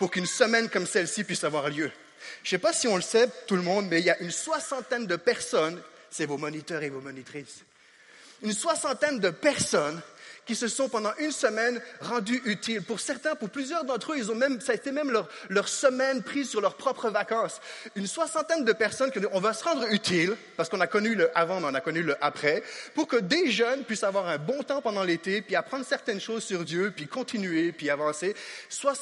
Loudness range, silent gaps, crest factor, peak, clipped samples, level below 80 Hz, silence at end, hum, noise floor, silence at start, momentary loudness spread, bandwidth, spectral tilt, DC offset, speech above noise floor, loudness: 4 LU; none; 22 dB; -6 dBFS; under 0.1%; -74 dBFS; 0 s; none; -56 dBFS; 0 s; 9 LU; 11.5 kHz; -3.5 dB/octave; under 0.1%; 28 dB; -28 LUFS